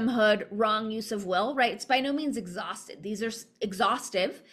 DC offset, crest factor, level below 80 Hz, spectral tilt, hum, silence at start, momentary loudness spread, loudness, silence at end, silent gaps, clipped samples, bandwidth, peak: under 0.1%; 18 dB; -70 dBFS; -3.5 dB/octave; none; 0 s; 11 LU; -29 LUFS; 0.15 s; none; under 0.1%; 14.5 kHz; -10 dBFS